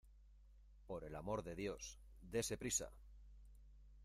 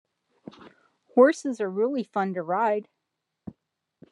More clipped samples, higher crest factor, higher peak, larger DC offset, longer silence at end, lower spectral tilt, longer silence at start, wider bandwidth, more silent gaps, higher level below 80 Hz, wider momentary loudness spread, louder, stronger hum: neither; about the same, 22 dB vs 22 dB; second, -28 dBFS vs -6 dBFS; neither; second, 0 s vs 1.3 s; second, -3.5 dB/octave vs -6 dB/octave; second, 0.05 s vs 0.65 s; first, 15.5 kHz vs 10.5 kHz; neither; first, -62 dBFS vs -76 dBFS; about the same, 24 LU vs 26 LU; second, -46 LUFS vs -25 LUFS; neither